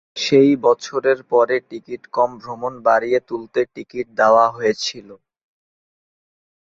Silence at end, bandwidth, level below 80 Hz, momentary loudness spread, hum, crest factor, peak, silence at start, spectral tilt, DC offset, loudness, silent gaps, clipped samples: 1.6 s; 7.8 kHz; -64 dBFS; 14 LU; none; 18 dB; -2 dBFS; 0.15 s; -4.5 dB/octave; under 0.1%; -18 LUFS; none; under 0.1%